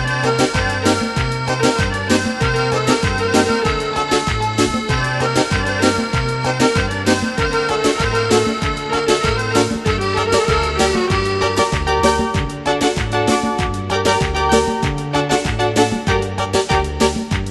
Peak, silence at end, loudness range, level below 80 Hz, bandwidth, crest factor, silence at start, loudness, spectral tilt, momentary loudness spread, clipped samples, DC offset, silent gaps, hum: 0 dBFS; 0 s; 1 LU; -30 dBFS; 12 kHz; 16 dB; 0 s; -17 LUFS; -4.5 dB/octave; 4 LU; under 0.1%; under 0.1%; none; none